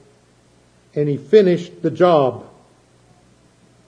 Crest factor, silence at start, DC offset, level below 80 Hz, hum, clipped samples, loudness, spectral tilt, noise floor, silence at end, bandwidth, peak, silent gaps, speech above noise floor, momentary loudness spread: 20 dB; 0.95 s; under 0.1%; -64 dBFS; 60 Hz at -45 dBFS; under 0.1%; -17 LUFS; -8 dB/octave; -54 dBFS; 1.5 s; 9 kHz; 0 dBFS; none; 38 dB; 13 LU